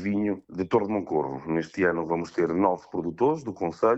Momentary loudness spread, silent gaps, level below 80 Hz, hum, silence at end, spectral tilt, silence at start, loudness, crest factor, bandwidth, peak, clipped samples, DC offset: 6 LU; none; -60 dBFS; none; 0 s; -7.5 dB/octave; 0 s; -27 LUFS; 18 dB; 8 kHz; -8 dBFS; under 0.1%; under 0.1%